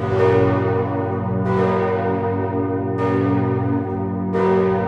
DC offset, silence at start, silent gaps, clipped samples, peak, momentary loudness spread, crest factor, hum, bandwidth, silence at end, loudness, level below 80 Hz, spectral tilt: under 0.1%; 0 s; none; under 0.1%; -4 dBFS; 5 LU; 14 dB; none; 6.8 kHz; 0 s; -20 LUFS; -50 dBFS; -9.5 dB/octave